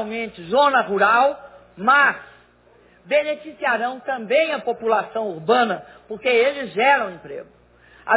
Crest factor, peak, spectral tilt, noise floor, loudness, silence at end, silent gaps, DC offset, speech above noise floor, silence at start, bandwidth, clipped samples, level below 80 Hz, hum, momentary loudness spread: 18 dB; -4 dBFS; -7.5 dB/octave; -54 dBFS; -20 LUFS; 0 s; none; under 0.1%; 34 dB; 0 s; 4 kHz; under 0.1%; -62 dBFS; 60 Hz at -60 dBFS; 16 LU